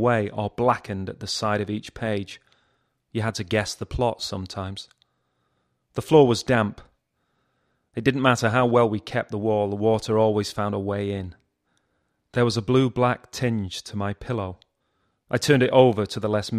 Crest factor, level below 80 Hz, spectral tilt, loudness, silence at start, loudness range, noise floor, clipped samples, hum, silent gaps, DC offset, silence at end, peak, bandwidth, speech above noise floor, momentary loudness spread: 22 dB; -50 dBFS; -6 dB/octave; -23 LUFS; 0 s; 6 LU; -73 dBFS; under 0.1%; none; none; under 0.1%; 0 s; -2 dBFS; 14.5 kHz; 50 dB; 13 LU